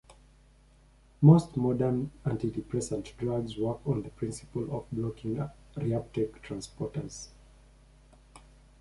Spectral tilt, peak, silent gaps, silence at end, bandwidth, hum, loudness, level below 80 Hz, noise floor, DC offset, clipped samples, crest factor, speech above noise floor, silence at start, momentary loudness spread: -8 dB/octave; -8 dBFS; none; 0.4 s; 11.5 kHz; none; -30 LUFS; -54 dBFS; -59 dBFS; under 0.1%; under 0.1%; 22 dB; 30 dB; 0.1 s; 15 LU